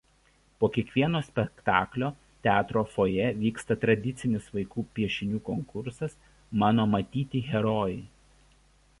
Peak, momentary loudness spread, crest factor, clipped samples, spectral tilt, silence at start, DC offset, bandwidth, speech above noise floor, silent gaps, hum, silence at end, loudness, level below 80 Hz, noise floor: -6 dBFS; 9 LU; 22 dB; under 0.1%; -7 dB/octave; 0.6 s; under 0.1%; 11.5 kHz; 36 dB; none; none; 0.95 s; -28 LUFS; -54 dBFS; -64 dBFS